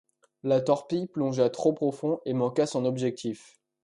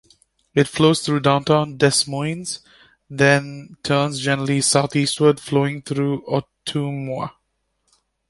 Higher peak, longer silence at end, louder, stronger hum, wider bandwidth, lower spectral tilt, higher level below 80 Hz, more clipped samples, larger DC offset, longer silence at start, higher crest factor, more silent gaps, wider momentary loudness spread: second, -8 dBFS vs -2 dBFS; second, 0.45 s vs 1 s; second, -28 LUFS vs -19 LUFS; neither; about the same, 11 kHz vs 11.5 kHz; first, -6.5 dB/octave vs -4.5 dB/octave; second, -72 dBFS vs -56 dBFS; neither; neither; about the same, 0.45 s vs 0.55 s; about the same, 18 dB vs 18 dB; neither; about the same, 10 LU vs 12 LU